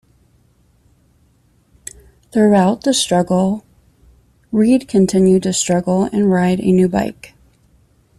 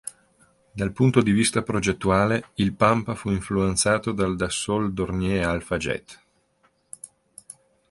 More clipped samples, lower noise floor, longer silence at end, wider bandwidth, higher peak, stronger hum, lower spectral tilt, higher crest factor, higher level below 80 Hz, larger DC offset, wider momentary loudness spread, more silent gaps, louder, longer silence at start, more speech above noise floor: neither; second, -56 dBFS vs -65 dBFS; first, 0.9 s vs 0.4 s; about the same, 12.5 kHz vs 11.5 kHz; about the same, -2 dBFS vs -2 dBFS; neither; about the same, -5.5 dB/octave vs -5 dB/octave; second, 14 dB vs 22 dB; about the same, -48 dBFS vs -44 dBFS; neither; second, 13 LU vs 21 LU; neither; first, -15 LUFS vs -23 LUFS; first, 2.35 s vs 0.05 s; about the same, 42 dB vs 43 dB